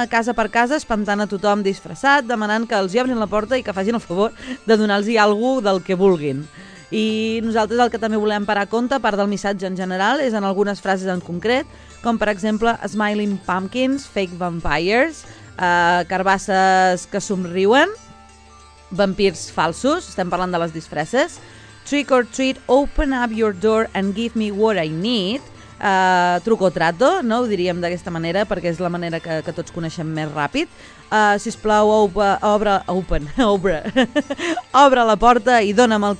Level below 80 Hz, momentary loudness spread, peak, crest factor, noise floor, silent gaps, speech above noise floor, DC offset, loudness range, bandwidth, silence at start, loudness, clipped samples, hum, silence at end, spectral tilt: -40 dBFS; 9 LU; 0 dBFS; 18 dB; -45 dBFS; none; 27 dB; under 0.1%; 4 LU; 10.5 kHz; 0 s; -19 LUFS; under 0.1%; none; 0 s; -5 dB/octave